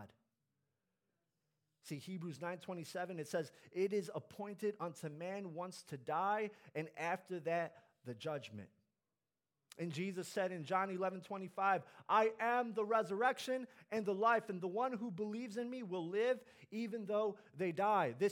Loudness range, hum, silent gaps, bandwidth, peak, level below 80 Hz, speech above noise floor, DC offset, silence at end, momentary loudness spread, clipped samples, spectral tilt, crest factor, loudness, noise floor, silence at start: 8 LU; none; none; 17.5 kHz; -20 dBFS; under -90 dBFS; over 50 dB; under 0.1%; 0 s; 12 LU; under 0.1%; -5.5 dB/octave; 20 dB; -40 LUFS; under -90 dBFS; 0 s